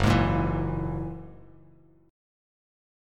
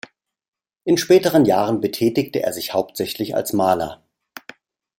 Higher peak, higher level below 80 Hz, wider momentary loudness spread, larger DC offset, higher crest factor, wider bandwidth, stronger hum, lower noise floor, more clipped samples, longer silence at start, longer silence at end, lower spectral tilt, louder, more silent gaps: second, -8 dBFS vs -2 dBFS; first, -40 dBFS vs -58 dBFS; first, 19 LU vs 15 LU; neither; about the same, 22 dB vs 18 dB; second, 13.5 kHz vs 16.5 kHz; neither; first, -57 dBFS vs -46 dBFS; neither; second, 0 s vs 0.85 s; first, 1.75 s vs 1.05 s; first, -7 dB/octave vs -5 dB/octave; second, -28 LUFS vs -19 LUFS; neither